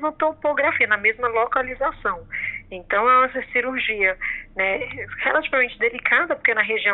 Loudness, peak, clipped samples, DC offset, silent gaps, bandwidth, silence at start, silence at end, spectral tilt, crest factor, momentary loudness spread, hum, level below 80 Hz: -21 LUFS; -6 dBFS; under 0.1%; under 0.1%; none; 4.2 kHz; 0 s; 0 s; -0.5 dB/octave; 16 dB; 9 LU; none; -50 dBFS